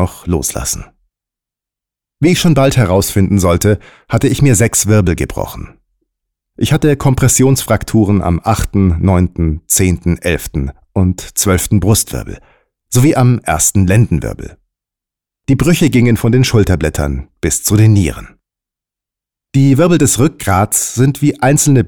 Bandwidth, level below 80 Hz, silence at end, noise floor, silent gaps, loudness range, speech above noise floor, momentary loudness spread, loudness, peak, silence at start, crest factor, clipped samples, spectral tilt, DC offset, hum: over 20 kHz; -28 dBFS; 0 s; -85 dBFS; none; 2 LU; 74 dB; 10 LU; -12 LUFS; -2 dBFS; 0 s; 10 dB; under 0.1%; -5.5 dB/octave; under 0.1%; none